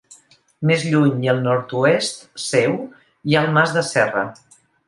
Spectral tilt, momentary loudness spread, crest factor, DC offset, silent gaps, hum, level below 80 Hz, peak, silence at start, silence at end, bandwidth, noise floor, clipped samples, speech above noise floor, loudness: -5.5 dB/octave; 11 LU; 18 dB; under 0.1%; none; none; -62 dBFS; -2 dBFS; 0.1 s; 0.55 s; 11.5 kHz; -50 dBFS; under 0.1%; 32 dB; -19 LUFS